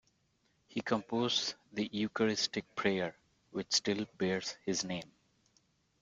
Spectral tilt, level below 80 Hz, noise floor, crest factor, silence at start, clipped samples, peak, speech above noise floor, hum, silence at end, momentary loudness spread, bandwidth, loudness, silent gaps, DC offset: -3.5 dB/octave; -72 dBFS; -75 dBFS; 20 dB; 0.7 s; under 0.1%; -16 dBFS; 40 dB; none; 0.95 s; 10 LU; 9.4 kHz; -35 LUFS; none; under 0.1%